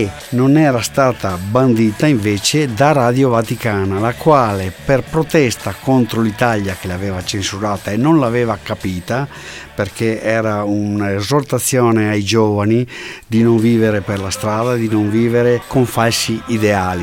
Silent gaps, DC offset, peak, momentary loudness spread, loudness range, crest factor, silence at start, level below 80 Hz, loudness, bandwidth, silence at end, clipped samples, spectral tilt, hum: none; under 0.1%; 0 dBFS; 9 LU; 4 LU; 14 dB; 0 s; -44 dBFS; -15 LUFS; 17 kHz; 0 s; under 0.1%; -5.5 dB/octave; none